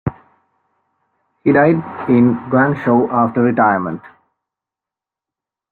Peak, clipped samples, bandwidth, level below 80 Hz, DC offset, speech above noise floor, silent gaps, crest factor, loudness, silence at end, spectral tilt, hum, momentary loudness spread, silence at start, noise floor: -2 dBFS; under 0.1%; 4.3 kHz; -52 dBFS; under 0.1%; 73 dB; none; 16 dB; -15 LUFS; 1.65 s; -11 dB/octave; none; 8 LU; 0.05 s; -87 dBFS